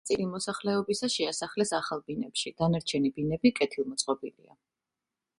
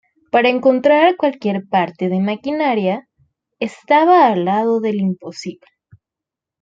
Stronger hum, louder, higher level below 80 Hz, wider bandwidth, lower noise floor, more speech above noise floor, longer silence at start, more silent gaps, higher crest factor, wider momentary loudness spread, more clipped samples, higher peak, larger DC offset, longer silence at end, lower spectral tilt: neither; second, -30 LUFS vs -16 LUFS; about the same, -62 dBFS vs -64 dBFS; first, 11.5 kHz vs 7.8 kHz; about the same, -89 dBFS vs -86 dBFS; second, 59 dB vs 70 dB; second, 0.05 s vs 0.35 s; neither; about the same, 20 dB vs 16 dB; second, 7 LU vs 14 LU; neither; second, -10 dBFS vs -2 dBFS; neither; about the same, 1.1 s vs 1.1 s; second, -4.5 dB/octave vs -6.5 dB/octave